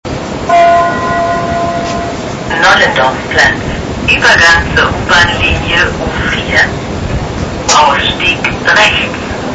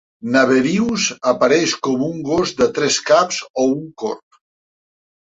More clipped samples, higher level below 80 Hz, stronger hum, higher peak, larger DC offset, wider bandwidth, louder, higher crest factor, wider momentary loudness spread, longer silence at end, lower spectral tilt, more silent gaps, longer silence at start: first, 0.2% vs under 0.1%; first, -26 dBFS vs -54 dBFS; neither; about the same, 0 dBFS vs -2 dBFS; first, 0.4% vs under 0.1%; first, 11 kHz vs 8.2 kHz; first, -9 LUFS vs -17 LUFS; second, 10 dB vs 16 dB; about the same, 11 LU vs 9 LU; second, 0 s vs 1.2 s; about the same, -3.5 dB/octave vs -3.5 dB/octave; second, none vs 3.50-3.54 s; second, 0.05 s vs 0.25 s